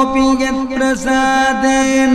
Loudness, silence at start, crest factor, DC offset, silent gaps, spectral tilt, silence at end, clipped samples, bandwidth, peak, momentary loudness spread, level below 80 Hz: -14 LUFS; 0 s; 12 dB; under 0.1%; none; -3 dB/octave; 0 s; under 0.1%; 12.5 kHz; -2 dBFS; 4 LU; -36 dBFS